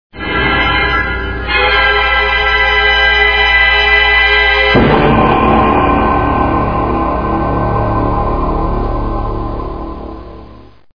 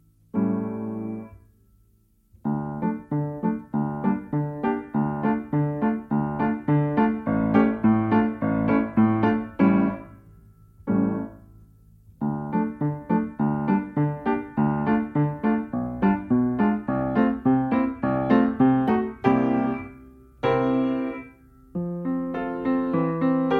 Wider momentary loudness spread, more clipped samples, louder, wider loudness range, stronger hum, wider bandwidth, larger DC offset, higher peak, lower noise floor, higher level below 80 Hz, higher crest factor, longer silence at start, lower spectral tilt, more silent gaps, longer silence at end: first, 12 LU vs 9 LU; neither; first, -11 LUFS vs -24 LUFS; about the same, 8 LU vs 7 LU; neither; first, 5.4 kHz vs 4.7 kHz; first, 2% vs under 0.1%; first, 0 dBFS vs -4 dBFS; second, -37 dBFS vs -61 dBFS; first, -22 dBFS vs -52 dBFS; second, 12 dB vs 20 dB; second, 0.1 s vs 0.35 s; second, -6.5 dB/octave vs -10.5 dB/octave; neither; first, 0.35 s vs 0 s